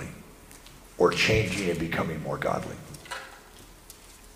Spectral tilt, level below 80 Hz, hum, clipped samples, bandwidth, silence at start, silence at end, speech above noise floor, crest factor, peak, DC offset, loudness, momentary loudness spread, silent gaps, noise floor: -4.5 dB/octave; -48 dBFS; none; under 0.1%; 15.5 kHz; 0 s; 0.05 s; 23 dB; 22 dB; -8 dBFS; under 0.1%; -27 LUFS; 25 LU; none; -50 dBFS